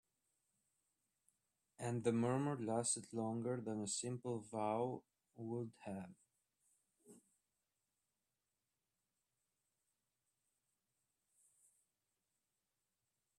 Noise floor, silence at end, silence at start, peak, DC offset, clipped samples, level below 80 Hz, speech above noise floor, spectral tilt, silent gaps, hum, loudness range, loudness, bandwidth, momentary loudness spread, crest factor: under -90 dBFS; 6.2 s; 1.8 s; -24 dBFS; under 0.1%; under 0.1%; -86 dBFS; over 48 dB; -5 dB/octave; none; 50 Hz at -80 dBFS; 13 LU; -42 LUFS; 12.5 kHz; 12 LU; 22 dB